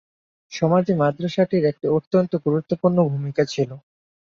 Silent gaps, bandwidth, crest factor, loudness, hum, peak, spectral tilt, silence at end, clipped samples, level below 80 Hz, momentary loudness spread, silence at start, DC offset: 2.07-2.11 s; 7.4 kHz; 16 dB; -21 LUFS; none; -6 dBFS; -7.5 dB/octave; 0.55 s; under 0.1%; -62 dBFS; 5 LU; 0.5 s; under 0.1%